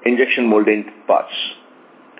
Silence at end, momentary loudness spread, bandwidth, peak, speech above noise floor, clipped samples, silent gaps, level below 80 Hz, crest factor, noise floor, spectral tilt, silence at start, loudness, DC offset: 0.65 s; 10 LU; 4 kHz; -2 dBFS; 29 dB; under 0.1%; none; under -90 dBFS; 16 dB; -46 dBFS; -8.5 dB/octave; 0 s; -17 LUFS; under 0.1%